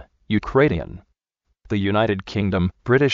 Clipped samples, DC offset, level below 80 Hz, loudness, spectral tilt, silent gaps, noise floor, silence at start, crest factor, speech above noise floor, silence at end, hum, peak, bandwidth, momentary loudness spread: under 0.1%; under 0.1%; -42 dBFS; -21 LUFS; -5.5 dB/octave; none; -73 dBFS; 0.3 s; 18 dB; 53 dB; 0 s; none; -4 dBFS; 7.4 kHz; 8 LU